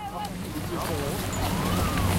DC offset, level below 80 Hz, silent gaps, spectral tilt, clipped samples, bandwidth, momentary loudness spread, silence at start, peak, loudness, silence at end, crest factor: under 0.1%; -38 dBFS; none; -5 dB/octave; under 0.1%; 16.5 kHz; 8 LU; 0 s; -14 dBFS; -29 LUFS; 0 s; 14 dB